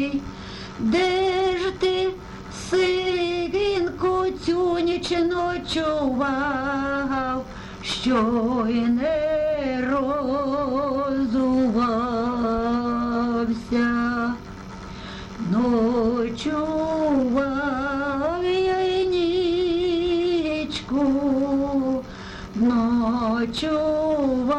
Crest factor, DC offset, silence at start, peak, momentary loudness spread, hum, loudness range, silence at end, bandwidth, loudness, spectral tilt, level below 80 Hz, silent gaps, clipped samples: 12 dB; under 0.1%; 0 s; -10 dBFS; 7 LU; none; 2 LU; 0 s; 10.5 kHz; -23 LUFS; -5.5 dB/octave; -44 dBFS; none; under 0.1%